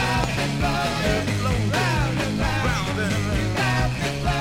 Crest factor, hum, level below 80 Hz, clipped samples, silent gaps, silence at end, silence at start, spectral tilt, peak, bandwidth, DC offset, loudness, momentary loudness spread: 16 dB; none; -32 dBFS; under 0.1%; none; 0 s; 0 s; -5 dB/octave; -6 dBFS; 16.5 kHz; under 0.1%; -23 LUFS; 2 LU